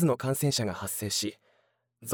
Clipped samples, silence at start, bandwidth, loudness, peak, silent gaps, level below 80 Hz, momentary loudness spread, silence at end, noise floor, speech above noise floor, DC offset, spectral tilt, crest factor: under 0.1%; 0 s; over 20 kHz; -29 LUFS; -12 dBFS; none; -70 dBFS; 8 LU; 0 s; -72 dBFS; 43 dB; under 0.1%; -4.5 dB/octave; 18 dB